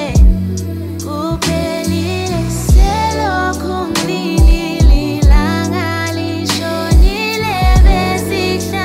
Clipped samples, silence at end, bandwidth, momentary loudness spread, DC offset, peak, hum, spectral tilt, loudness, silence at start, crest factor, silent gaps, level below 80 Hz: under 0.1%; 0 s; 16 kHz; 7 LU; under 0.1%; 0 dBFS; none; -5.5 dB/octave; -14 LUFS; 0 s; 12 dB; none; -14 dBFS